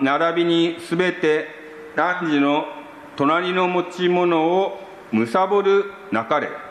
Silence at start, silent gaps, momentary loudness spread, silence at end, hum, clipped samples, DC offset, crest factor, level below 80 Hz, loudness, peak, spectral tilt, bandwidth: 0 s; none; 10 LU; 0 s; none; under 0.1%; under 0.1%; 16 dB; -68 dBFS; -20 LUFS; -6 dBFS; -6 dB/octave; 11.5 kHz